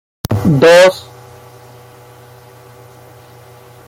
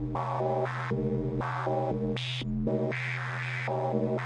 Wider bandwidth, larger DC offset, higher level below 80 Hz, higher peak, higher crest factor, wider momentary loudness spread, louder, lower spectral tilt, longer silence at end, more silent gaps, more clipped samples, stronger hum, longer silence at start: first, 16.5 kHz vs 9.6 kHz; neither; about the same, -46 dBFS vs -48 dBFS; first, 0 dBFS vs -16 dBFS; about the same, 16 dB vs 14 dB; first, 15 LU vs 3 LU; first, -9 LUFS vs -31 LUFS; second, -5.5 dB/octave vs -7 dB/octave; first, 2.85 s vs 0 s; neither; neither; neither; first, 0.3 s vs 0 s